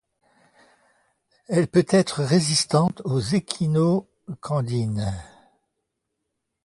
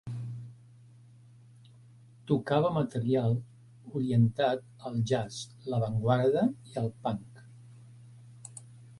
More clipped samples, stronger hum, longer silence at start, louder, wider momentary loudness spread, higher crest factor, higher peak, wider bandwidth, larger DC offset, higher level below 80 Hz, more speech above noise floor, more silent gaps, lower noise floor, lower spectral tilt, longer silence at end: neither; neither; first, 1.5 s vs 0.05 s; first, -22 LUFS vs -30 LUFS; second, 9 LU vs 20 LU; about the same, 20 dB vs 20 dB; first, -4 dBFS vs -12 dBFS; about the same, 11.5 kHz vs 11.5 kHz; neither; first, -52 dBFS vs -64 dBFS; first, 58 dB vs 27 dB; neither; first, -79 dBFS vs -55 dBFS; second, -5.5 dB/octave vs -7.5 dB/octave; first, 1.4 s vs 0.05 s